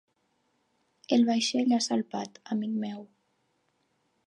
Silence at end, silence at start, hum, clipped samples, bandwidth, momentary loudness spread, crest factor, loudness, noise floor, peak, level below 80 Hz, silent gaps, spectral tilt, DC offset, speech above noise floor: 1.2 s; 1.1 s; none; under 0.1%; 10.5 kHz; 13 LU; 20 dB; -28 LUFS; -74 dBFS; -10 dBFS; -84 dBFS; none; -4 dB/octave; under 0.1%; 46 dB